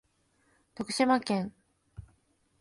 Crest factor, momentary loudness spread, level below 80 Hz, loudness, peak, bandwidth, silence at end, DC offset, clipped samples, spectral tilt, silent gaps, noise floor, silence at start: 22 dB; 26 LU; -64 dBFS; -30 LUFS; -12 dBFS; 11.5 kHz; 0.6 s; under 0.1%; under 0.1%; -4.5 dB/octave; none; -71 dBFS; 0.8 s